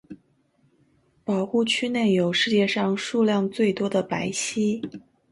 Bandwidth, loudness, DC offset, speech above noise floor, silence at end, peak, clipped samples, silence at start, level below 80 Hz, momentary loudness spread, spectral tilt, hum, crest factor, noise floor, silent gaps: 11.5 kHz; -23 LUFS; under 0.1%; 42 dB; 0.35 s; -8 dBFS; under 0.1%; 0.1 s; -66 dBFS; 6 LU; -4.5 dB/octave; none; 16 dB; -65 dBFS; none